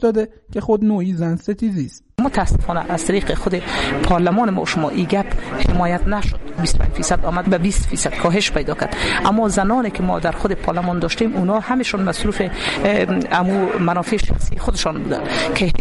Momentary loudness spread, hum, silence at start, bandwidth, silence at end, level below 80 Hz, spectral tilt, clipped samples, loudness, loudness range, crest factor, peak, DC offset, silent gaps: 5 LU; none; 0 s; 11.5 kHz; 0 s; -26 dBFS; -5 dB/octave; under 0.1%; -19 LUFS; 2 LU; 14 dB; -4 dBFS; under 0.1%; none